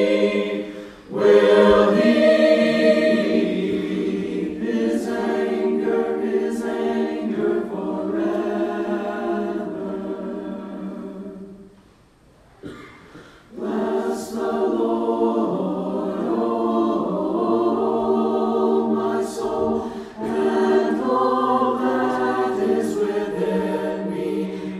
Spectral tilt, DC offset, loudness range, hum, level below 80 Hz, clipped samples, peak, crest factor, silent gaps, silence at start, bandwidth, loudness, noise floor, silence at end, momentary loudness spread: -6.5 dB/octave; under 0.1%; 13 LU; none; -56 dBFS; under 0.1%; -2 dBFS; 18 dB; none; 0 s; 13.5 kHz; -21 LUFS; -53 dBFS; 0 s; 14 LU